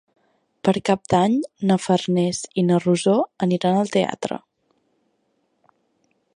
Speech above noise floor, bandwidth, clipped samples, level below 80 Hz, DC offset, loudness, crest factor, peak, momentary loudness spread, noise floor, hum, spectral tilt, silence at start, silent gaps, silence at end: 49 dB; 10.5 kHz; under 0.1%; -60 dBFS; under 0.1%; -21 LUFS; 20 dB; -2 dBFS; 6 LU; -69 dBFS; none; -6 dB/octave; 0.65 s; none; 2 s